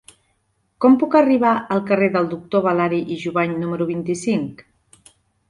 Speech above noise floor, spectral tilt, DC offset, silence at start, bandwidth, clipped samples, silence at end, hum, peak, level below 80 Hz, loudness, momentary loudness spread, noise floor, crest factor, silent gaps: 49 dB; -7 dB/octave; under 0.1%; 0.8 s; 11.5 kHz; under 0.1%; 0.95 s; none; -2 dBFS; -60 dBFS; -19 LUFS; 9 LU; -67 dBFS; 18 dB; none